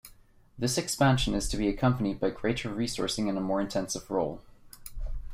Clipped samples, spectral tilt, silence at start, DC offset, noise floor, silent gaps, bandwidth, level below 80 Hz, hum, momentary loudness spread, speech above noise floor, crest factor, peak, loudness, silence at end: under 0.1%; -5 dB/octave; 0.05 s; under 0.1%; -56 dBFS; none; 16 kHz; -42 dBFS; none; 17 LU; 28 dB; 18 dB; -12 dBFS; -29 LUFS; 0 s